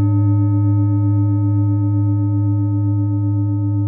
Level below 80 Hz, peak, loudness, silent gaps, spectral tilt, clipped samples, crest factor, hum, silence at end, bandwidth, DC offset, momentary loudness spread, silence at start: -62 dBFS; -8 dBFS; -17 LUFS; none; -17.5 dB/octave; under 0.1%; 8 dB; none; 0 s; 1.8 kHz; under 0.1%; 3 LU; 0 s